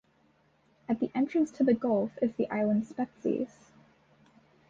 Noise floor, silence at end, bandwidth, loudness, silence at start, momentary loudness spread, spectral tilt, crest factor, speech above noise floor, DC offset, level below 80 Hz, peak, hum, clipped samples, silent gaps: -67 dBFS; 1.25 s; 7.6 kHz; -30 LUFS; 0.9 s; 8 LU; -8 dB/octave; 18 dB; 38 dB; under 0.1%; -70 dBFS; -14 dBFS; none; under 0.1%; none